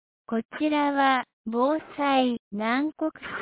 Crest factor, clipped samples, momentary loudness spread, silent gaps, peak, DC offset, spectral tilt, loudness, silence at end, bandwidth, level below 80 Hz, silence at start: 16 dB; under 0.1%; 9 LU; 0.45-0.49 s, 1.33-1.44 s, 2.39-2.51 s; -10 dBFS; under 0.1%; -8.5 dB/octave; -26 LUFS; 0 s; 4 kHz; -68 dBFS; 0.3 s